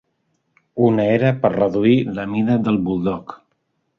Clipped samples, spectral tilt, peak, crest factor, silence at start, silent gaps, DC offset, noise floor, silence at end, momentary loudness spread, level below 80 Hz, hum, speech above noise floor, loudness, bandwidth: under 0.1%; -9.5 dB/octave; -2 dBFS; 18 dB; 0.75 s; none; under 0.1%; -70 dBFS; 0.65 s; 10 LU; -52 dBFS; none; 52 dB; -18 LUFS; 6.4 kHz